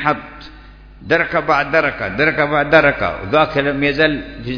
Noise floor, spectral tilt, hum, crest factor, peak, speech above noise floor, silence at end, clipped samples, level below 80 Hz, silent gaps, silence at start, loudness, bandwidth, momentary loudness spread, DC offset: -39 dBFS; -6.5 dB/octave; none; 16 dB; 0 dBFS; 23 dB; 0 s; under 0.1%; -40 dBFS; none; 0 s; -15 LUFS; 5.4 kHz; 8 LU; under 0.1%